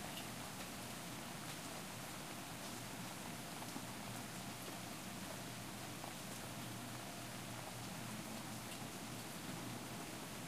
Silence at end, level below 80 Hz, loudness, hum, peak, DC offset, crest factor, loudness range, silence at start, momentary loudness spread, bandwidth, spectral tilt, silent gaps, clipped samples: 0 s; -70 dBFS; -48 LUFS; none; -32 dBFS; under 0.1%; 16 dB; 0 LU; 0 s; 1 LU; 15.5 kHz; -3.5 dB/octave; none; under 0.1%